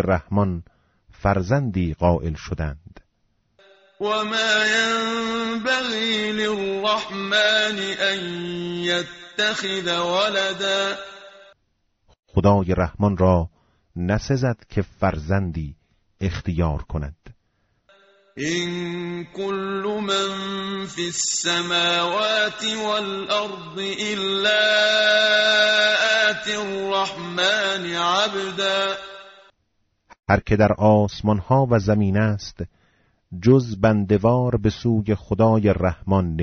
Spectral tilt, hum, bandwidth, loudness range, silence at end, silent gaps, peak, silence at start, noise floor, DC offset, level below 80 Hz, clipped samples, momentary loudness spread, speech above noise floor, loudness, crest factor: -3.5 dB/octave; none; 8 kHz; 8 LU; 0 s; 12.19-12.23 s; -4 dBFS; 0 s; -70 dBFS; under 0.1%; -42 dBFS; under 0.1%; 12 LU; 49 dB; -21 LUFS; 18 dB